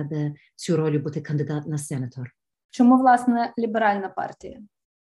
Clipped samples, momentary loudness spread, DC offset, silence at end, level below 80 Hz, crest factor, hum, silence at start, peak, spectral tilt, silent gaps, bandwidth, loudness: under 0.1%; 20 LU; under 0.1%; 0.35 s; -66 dBFS; 18 dB; none; 0 s; -4 dBFS; -7 dB/octave; 2.65-2.69 s; 12 kHz; -23 LUFS